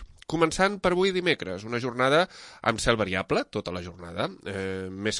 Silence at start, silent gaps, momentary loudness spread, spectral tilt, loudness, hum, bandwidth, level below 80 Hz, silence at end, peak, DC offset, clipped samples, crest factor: 0 s; none; 10 LU; -4.5 dB/octave; -27 LUFS; none; 11.5 kHz; -50 dBFS; 0 s; -6 dBFS; under 0.1%; under 0.1%; 20 dB